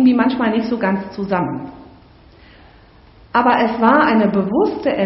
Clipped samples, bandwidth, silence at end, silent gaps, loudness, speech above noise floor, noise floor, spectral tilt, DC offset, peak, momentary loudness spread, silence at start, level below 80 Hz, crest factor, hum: under 0.1%; 5.8 kHz; 0 s; none; -16 LUFS; 30 dB; -46 dBFS; -5 dB/octave; under 0.1%; -2 dBFS; 9 LU; 0 s; -50 dBFS; 16 dB; none